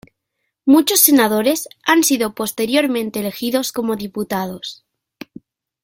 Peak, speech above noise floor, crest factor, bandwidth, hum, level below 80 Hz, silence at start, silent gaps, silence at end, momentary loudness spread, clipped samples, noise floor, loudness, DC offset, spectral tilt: 0 dBFS; 58 dB; 18 dB; 17 kHz; none; -60 dBFS; 0.65 s; none; 1.1 s; 13 LU; under 0.1%; -75 dBFS; -16 LUFS; under 0.1%; -3 dB/octave